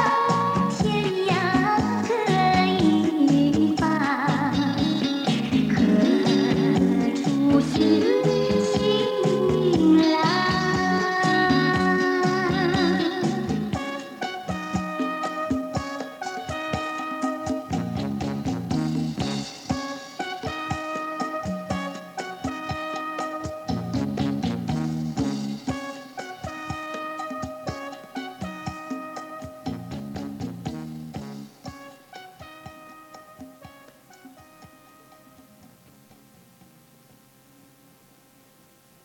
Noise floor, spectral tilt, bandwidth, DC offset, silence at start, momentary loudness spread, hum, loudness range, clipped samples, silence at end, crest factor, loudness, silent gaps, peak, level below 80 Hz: -56 dBFS; -6 dB/octave; 17 kHz; under 0.1%; 0 s; 16 LU; none; 14 LU; under 0.1%; 4.4 s; 18 dB; -24 LUFS; none; -8 dBFS; -50 dBFS